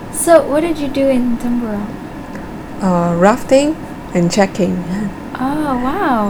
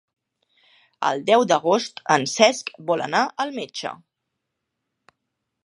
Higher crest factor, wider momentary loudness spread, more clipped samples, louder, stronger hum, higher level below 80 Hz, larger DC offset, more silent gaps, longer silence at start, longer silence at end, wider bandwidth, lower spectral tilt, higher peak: second, 16 dB vs 24 dB; first, 16 LU vs 12 LU; first, 0.1% vs under 0.1%; first, -15 LUFS vs -21 LUFS; neither; first, -36 dBFS vs -78 dBFS; neither; neither; second, 0 s vs 1 s; second, 0 s vs 1.7 s; first, over 20 kHz vs 11.5 kHz; first, -5.5 dB/octave vs -3 dB/octave; about the same, 0 dBFS vs 0 dBFS